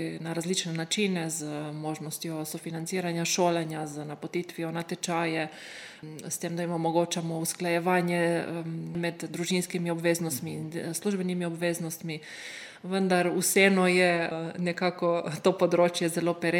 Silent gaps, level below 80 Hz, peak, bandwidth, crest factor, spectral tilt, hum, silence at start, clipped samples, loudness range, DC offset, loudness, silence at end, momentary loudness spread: none; -76 dBFS; -6 dBFS; 17.5 kHz; 22 dB; -4.5 dB/octave; none; 0 s; under 0.1%; 6 LU; under 0.1%; -29 LUFS; 0 s; 11 LU